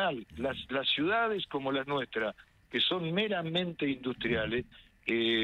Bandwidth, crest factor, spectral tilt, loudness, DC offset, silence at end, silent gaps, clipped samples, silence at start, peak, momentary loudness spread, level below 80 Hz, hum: 10 kHz; 16 dB; -6.5 dB/octave; -32 LUFS; under 0.1%; 0 s; none; under 0.1%; 0 s; -16 dBFS; 8 LU; -60 dBFS; none